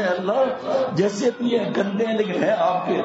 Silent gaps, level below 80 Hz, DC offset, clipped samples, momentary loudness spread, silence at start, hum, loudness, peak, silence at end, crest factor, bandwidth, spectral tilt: none; -70 dBFS; under 0.1%; under 0.1%; 2 LU; 0 s; none; -22 LUFS; -6 dBFS; 0 s; 14 dB; 8 kHz; -6 dB/octave